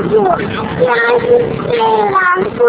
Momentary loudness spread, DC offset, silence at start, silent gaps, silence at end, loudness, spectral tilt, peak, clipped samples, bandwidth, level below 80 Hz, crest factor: 5 LU; under 0.1%; 0 s; none; 0 s; -12 LUFS; -9.5 dB/octave; 0 dBFS; under 0.1%; 4 kHz; -40 dBFS; 12 dB